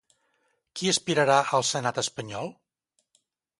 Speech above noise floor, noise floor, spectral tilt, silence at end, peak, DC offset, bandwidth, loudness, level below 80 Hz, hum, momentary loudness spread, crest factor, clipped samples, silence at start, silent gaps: 51 dB; -76 dBFS; -3 dB/octave; 1.1 s; -6 dBFS; under 0.1%; 11.5 kHz; -25 LUFS; -70 dBFS; none; 15 LU; 22 dB; under 0.1%; 0.75 s; none